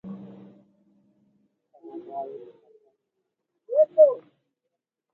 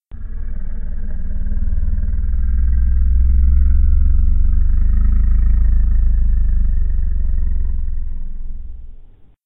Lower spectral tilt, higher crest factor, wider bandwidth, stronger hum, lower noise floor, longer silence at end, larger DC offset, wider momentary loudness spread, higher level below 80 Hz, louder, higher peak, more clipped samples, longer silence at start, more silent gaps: second, -10 dB/octave vs -13 dB/octave; first, 22 dB vs 10 dB; about the same, 2 kHz vs 2 kHz; neither; first, -83 dBFS vs -40 dBFS; first, 0.95 s vs 0.4 s; neither; first, 26 LU vs 15 LU; second, -82 dBFS vs -14 dBFS; about the same, -22 LUFS vs -20 LUFS; about the same, -6 dBFS vs -4 dBFS; neither; about the same, 0.05 s vs 0.1 s; neither